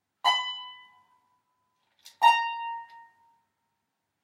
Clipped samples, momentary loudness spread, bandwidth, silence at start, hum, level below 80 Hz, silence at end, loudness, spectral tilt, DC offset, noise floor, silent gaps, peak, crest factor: under 0.1%; 18 LU; 16 kHz; 0.25 s; none; under -90 dBFS; 1.25 s; -25 LUFS; 3 dB/octave; under 0.1%; -81 dBFS; none; -8 dBFS; 24 dB